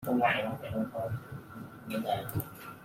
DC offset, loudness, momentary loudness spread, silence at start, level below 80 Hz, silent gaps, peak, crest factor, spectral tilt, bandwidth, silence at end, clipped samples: under 0.1%; -34 LUFS; 17 LU; 0 s; -62 dBFS; none; -14 dBFS; 20 dB; -6 dB/octave; 16.5 kHz; 0 s; under 0.1%